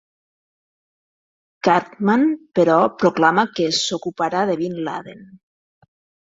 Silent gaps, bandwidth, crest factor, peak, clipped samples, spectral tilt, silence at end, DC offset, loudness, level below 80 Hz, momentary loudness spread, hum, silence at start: none; 7.8 kHz; 20 dB; 0 dBFS; under 0.1%; -4.5 dB/octave; 0.95 s; under 0.1%; -19 LUFS; -64 dBFS; 8 LU; none; 1.65 s